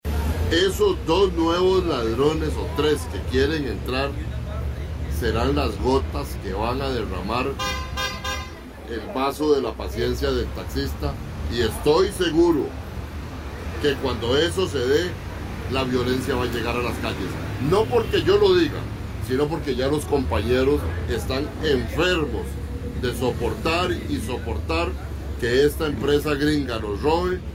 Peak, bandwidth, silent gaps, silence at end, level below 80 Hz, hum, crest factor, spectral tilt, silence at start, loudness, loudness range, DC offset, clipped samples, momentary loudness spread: -6 dBFS; 16 kHz; none; 0 s; -32 dBFS; none; 16 dB; -5.5 dB/octave; 0.05 s; -23 LUFS; 4 LU; under 0.1%; under 0.1%; 11 LU